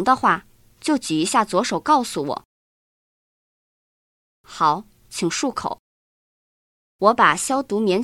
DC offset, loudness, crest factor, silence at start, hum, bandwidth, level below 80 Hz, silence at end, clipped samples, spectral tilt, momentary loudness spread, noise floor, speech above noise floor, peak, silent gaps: under 0.1%; -20 LUFS; 22 dB; 0 s; none; 16 kHz; -60 dBFS; 0 s; under 0.1%; -3.5 dB/octave; 13 LU; under -90 dBFS; over 70 dB; -2 dBFS; 2.45-4.44 s, 5.79-6.99 s